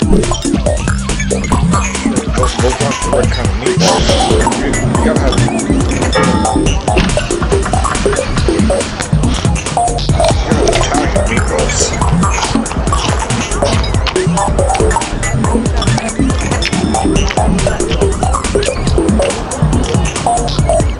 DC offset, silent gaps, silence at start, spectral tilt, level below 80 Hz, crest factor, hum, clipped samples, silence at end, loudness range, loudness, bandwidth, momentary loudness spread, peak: under 0.1%; none; 0 s; -5 dB/octave; -18 dBFS; 12 dB; none; under 0.1%; 0 s; 1 LU; -13 LUFS; 11.5 kHz; 3 LU; 0 dBFS